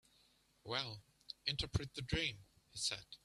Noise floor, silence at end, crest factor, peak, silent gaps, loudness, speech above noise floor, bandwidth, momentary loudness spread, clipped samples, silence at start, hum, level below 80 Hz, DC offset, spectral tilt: -73 dBFS; 0.1 s; 22 dB; -22 dBFS; none; -41 LUFS; 31 dB; 13.5 kHz; 16 LU; under 0.1%; 0.65 s; none; -58 dBFS; under 0.1%; -3 dB/octave